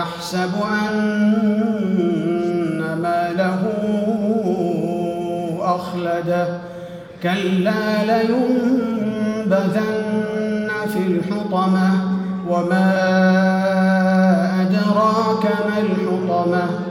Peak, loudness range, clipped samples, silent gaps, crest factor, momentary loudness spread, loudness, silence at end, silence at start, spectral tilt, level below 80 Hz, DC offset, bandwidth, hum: -6 dBFS; 5 LU; under 0.1%; none; 14 dB; 6 LU; -19 LUFS; 0 s; 0 s; -7.5 dB/octave; -58 dBFS; under 0.1%; 15 kHz; none